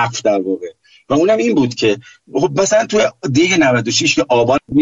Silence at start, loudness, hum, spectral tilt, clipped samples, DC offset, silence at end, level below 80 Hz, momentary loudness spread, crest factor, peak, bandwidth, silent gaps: 0 s; -14 LUFS; none; -4 dB/octave; under 0.1%; under 0.1%; 0 s; -50 dBFS; 8 LU; 12 dB; -4 dBFS; 8 kHz; none